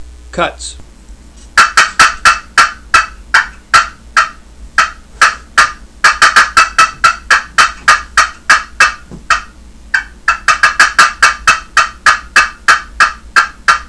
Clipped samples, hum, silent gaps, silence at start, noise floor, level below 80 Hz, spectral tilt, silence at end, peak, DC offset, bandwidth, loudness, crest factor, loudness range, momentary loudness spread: 2%; none; none; 0 s; -35 dBFS; -34 dBFS; 0 dB/octave; 0.05 s; 0 dBFS; 0.3%; 11 kHz; -9 LUFS; 12 dB; 3 LU; 9 LU